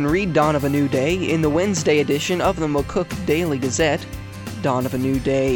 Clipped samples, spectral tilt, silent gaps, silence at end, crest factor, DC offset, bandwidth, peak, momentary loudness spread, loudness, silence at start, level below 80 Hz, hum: under 0.1%; -5.5 dB/octave; none; 0 s; 14 dB; under 0.1%; 18 kHz; -4 dBFS; 6 LU; -20 LUFS; 0 s; -38 dBFS; none